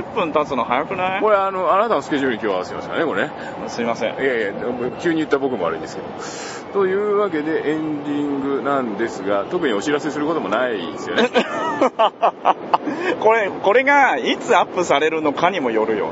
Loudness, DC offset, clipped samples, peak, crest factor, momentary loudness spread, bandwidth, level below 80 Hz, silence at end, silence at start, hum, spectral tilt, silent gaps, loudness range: -19 LUFS; under 0.1%; under 0.1%; 0 dBFS; 20 dB; 8 LU; 8 kHz; -58 dBFS; 0 s; 0 s; none; -4.5 dB/octave; none; 5 LU